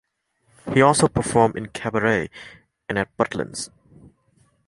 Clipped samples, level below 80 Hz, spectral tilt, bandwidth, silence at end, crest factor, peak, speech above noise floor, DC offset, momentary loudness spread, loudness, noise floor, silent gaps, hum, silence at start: under 0.1%; -50 dBFS; -5 dB/octave; 11.5 kHz; 1 s; 22 dB; -2 dBFS; 46 dB; under 0.1%; 18 LU; -21 LUFS; -66 dBFS; none; none; 0.65 s